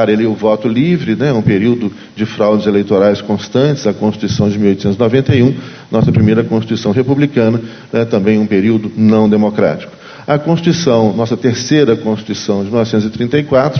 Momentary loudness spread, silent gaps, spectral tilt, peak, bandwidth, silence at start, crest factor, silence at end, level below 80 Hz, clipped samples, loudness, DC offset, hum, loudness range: 7 LU; none; -7 dB/octave; 0 dBFS; 6.6 kHz; 0 s; 12 dB; 0 s; -40 dBFS; under 0.1%; -13 LUFS; under 0.1%; none; 1 LU